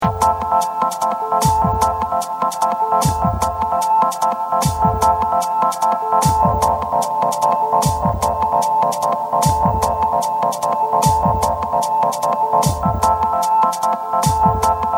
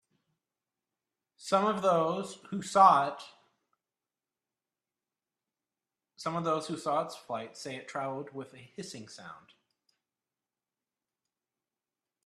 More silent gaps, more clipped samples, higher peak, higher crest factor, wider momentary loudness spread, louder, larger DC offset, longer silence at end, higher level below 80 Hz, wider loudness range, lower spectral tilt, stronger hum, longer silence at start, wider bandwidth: neither; neither; first, -2 dBFS vs -8 dBFS; second, 16 dB vs 26 dB; second, 4 LU vs 24 LU; first, -17 LUFS vs -30 LUFS; neither; second, 0 s vs 2.9 s; first, -34 dBFS vs -80 dBFS; second, 1 LU vs 19 LU; about the same, -5 dB/octave vs -5 dB/octave; neither; second, 0 s vs 1.4 s; first, over 20 kHz vs 13 kHz